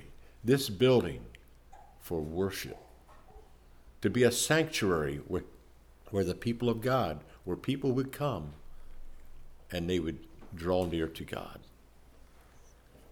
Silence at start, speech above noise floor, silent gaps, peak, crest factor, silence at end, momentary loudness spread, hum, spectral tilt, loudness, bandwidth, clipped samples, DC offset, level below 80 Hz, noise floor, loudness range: 0 s; 26 dB; none; -14 dBFS; 20 dB; 0.4 s; 20 LU; none; -5 dB/octave; -32 LUFS; 19 kHz; under 0.1%; under 0.1%; -52 dBFS; -57 dBFS; 6 LU